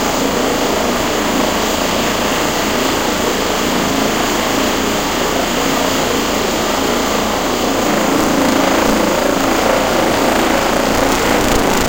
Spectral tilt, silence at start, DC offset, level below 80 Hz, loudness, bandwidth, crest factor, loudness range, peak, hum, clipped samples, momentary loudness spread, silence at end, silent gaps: -3 dB/octave; 0 s; under 0.1%; -30 dBFS; -14 LUFS; 17.5 kHz; 14 dB; 2 LU; 0 dBFS; none; under 0.1%; 2 LU; 0 s; none